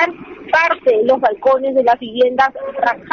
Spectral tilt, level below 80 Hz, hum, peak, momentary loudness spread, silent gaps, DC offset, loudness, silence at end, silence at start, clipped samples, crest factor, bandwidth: -4.5 dB/octave; -56 dBFS; none; -2 dBFS; 5 LU; none; under 0.1%; -15 LUFS; 0.05 s; 0 s; under 0.1%; 12 dB; 6.6 kHz